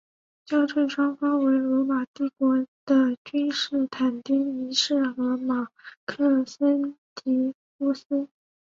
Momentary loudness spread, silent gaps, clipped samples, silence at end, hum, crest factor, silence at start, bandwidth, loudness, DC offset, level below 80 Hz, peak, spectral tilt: 8 LU; 2.07-2.14 s, 2.68-2.87 s, 3.18-3.25 s, 5.97-6.07 s, 6.98-7.16 s, 7.55-7.79 s, 8.05-8.10 s; under 0.1%; 0.4 s; none; 16 dB; 0.5 s; 7.6 kHz; -25 LUFS; under 0.1%; -72 dBFS; -10 dBFS; -3.5 dB/octave